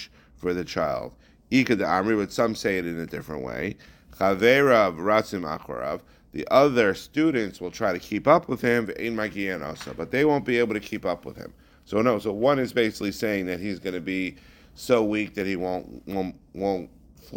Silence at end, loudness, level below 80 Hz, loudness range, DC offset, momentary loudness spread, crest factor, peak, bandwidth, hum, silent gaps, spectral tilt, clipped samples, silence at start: 0 s; -25 LUFS; -54 dBFS; 5 LU; under 0.1%; 13 LU; 22 dB; -4 dBFS; 17 kHz; none; none; -5.5 dB/octave; under 0.1%; 0 s